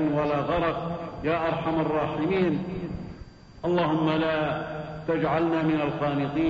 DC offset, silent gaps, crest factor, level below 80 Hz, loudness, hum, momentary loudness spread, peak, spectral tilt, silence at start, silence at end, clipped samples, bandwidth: under 0.1%; none; 14 dB; -50 dBFS; -26 LUFS; none; 10 LU; -12 dBFS; -8.5 dB/octave; 0 s; 0 s; under 0.1%; 7.4 kHz